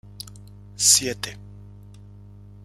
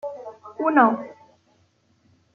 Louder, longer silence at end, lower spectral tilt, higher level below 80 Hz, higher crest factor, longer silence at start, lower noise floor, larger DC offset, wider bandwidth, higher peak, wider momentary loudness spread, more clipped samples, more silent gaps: about the same, -18 LUFS vs -20 LUFS; second, 0.95 s vs 1.25 s; second, -0.5 dB/octave vs -7.5 dB/octave; first, -52 dBFS vs -74 dBFS; about the same, 24 dB vs 22 dB; first, 0.2 s vs 0.05 s; second, -44 dBFS vs -63 dBFS; neither; first, 16.5 kHz vs 6.6 kHz; about the same, -2 dBFS vs -2 dBFS; about the same, 24 LU vs 22 LU; neither; neither